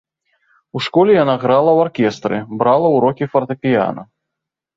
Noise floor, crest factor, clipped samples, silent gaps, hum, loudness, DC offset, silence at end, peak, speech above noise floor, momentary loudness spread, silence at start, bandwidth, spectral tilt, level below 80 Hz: -81 dBFS; 14 dB; under 0.1%; none; none; -15 LUFS; under 0.1%; 0.75 s; -2 dBFS; 67 dB; 10 LU; 0.75 s; 7.8 kHz; -7 dB/octave; -58 dBFS